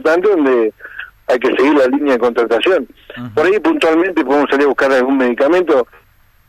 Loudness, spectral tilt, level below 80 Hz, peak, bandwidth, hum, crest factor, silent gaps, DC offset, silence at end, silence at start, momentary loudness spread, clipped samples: -13 LUFS; -5 dB/octave; -52 dBFS; -6 dBFS; 13.5 kHz; none; 8 dB; none; under 0.1%; 0.65 s; 0 s; 11 LU; under 0.1%